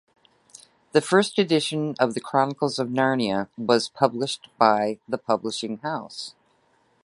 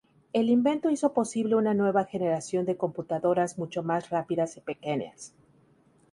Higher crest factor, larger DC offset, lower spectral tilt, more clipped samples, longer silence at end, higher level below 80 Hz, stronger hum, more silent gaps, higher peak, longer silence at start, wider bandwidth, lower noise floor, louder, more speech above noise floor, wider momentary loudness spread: about the same, 22 dB vs 18 dB; neither; second, -4.5 dB/octave vs -6 dB/octave; neither; about the same, 0.75 s vs 0.85 s; about the same, -68 dBFS vs -70 dBFS; neither; neither; first, -2 dBFS vs -10 dBFS; first, 0.95 s vs 0.35 s; about the same, 11.5 kHz vs 11.5 kHz; about the same, -64 dBFS vs -62 dBFS; first, -24 LUFS vs -28 LUFS; first, 41 dB vs 35 dB; about the same, 10 LU vs 9 LU